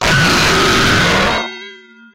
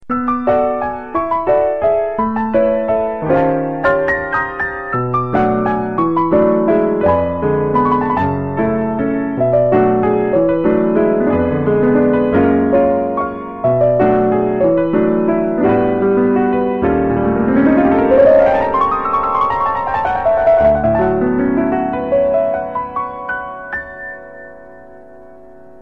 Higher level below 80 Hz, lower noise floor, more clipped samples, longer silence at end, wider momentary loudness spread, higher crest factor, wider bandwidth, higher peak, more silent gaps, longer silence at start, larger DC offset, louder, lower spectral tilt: first, -30 dBFS vs -40 dBFS; about the same, -37 dBFS vs -40 dBFS; neither; second, 0.4 s vs 0.55 s; first, 12 LU vs 8 LU; about the same, 10 dB vs 12 dB; first, 16.5 kHz vs 5.4 kHz; about the same, -4 dBFS vs -2 dBFS; neither; about the same, 0 s vs 0.1 s; second, under 0.1% vs 0.9%; first, -11 LUFS vs -15 LUFS; second, -3.5 dB/octave vs -10 dB/octave